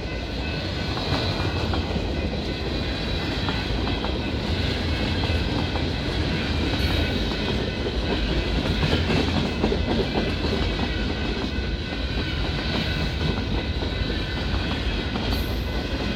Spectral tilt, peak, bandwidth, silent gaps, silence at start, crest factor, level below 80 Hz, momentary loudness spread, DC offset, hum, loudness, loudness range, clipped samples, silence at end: -6 dB/octave; -10 dBFS; 15.5 kHz; none; 0 s; 16 dB; -30 dBFS; 4 LU; under 0.1%; none; -25 LUFS; 2 LU; under 0.1%; 0 s